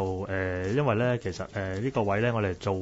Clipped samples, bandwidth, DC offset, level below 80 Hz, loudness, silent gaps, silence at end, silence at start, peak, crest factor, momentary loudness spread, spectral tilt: under 0.1%; 8 kHz; under 0.1%; -54 dBFS; -28 LUFS; none; 0 s; 0 s; -12 dBFS; 16 dB; 7 LU; -7 dB/octave